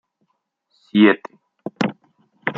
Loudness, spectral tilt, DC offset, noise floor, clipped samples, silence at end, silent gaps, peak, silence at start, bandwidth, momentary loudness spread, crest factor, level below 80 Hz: -19 LUFS; -7 dB/octave; under 0.1%; -71 dBFS; under 0.1%; 0 s; none; -2 dBFS; 0.95 s; 7 kHz; 22 LU; 20 dB; -70 dBFS